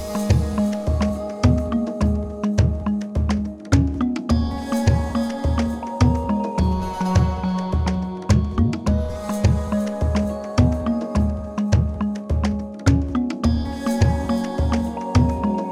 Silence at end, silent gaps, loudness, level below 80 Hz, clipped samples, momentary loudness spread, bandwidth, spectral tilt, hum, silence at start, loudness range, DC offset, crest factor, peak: 0 s; none; -22 LUFS; -26 dBFS; under 0.1%; 4 LU; 13 kHz; -7.5 dB/octave; none; 0 s; 1 LU; under 0.1%; 18 dB; -2 dBFS